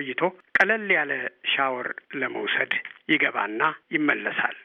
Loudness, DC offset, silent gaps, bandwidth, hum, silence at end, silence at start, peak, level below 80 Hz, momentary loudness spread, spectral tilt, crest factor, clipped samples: -24 LUFS; under 0.1%; none; 9.4 kHz; none; 0 s; 0 s; -6 dBFS; -74 dBFS; 8 LU; -5 dB/octave; 20 dB; under 0.1%